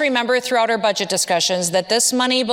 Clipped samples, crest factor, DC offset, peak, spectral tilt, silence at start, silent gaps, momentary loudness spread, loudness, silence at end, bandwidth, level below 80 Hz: under 0.1%; 14 dB; under 0.1%; -4 dBFS; -2 dB/octave; 0 s; none; 3 LU; -17 LUFS; 0 s; 18 kHz; -70 dBFS